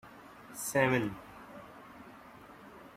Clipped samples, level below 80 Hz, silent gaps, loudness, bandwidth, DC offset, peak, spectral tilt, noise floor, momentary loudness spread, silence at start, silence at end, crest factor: under 0.1%; -66 dBFS; none; -31 LUFS; 16 kHz; under 0.1%; -14 dBFS; -5 dB/octave; -53 dBFS; 24 LU; 0.05 s; 0.05 s; 24 dB